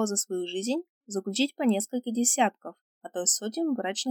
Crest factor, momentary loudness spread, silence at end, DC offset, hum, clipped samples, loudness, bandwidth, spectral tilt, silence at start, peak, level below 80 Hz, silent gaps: 18 dB; 13 LU; 0 s; under 0.1%; none; under 0.1%; -28 LUFS; over 20 kHz; -2.5 dB/octave; 0 s; -10 dBFS; under -90 dBFS; 0.89-1.01 s, 2.81-3.01 s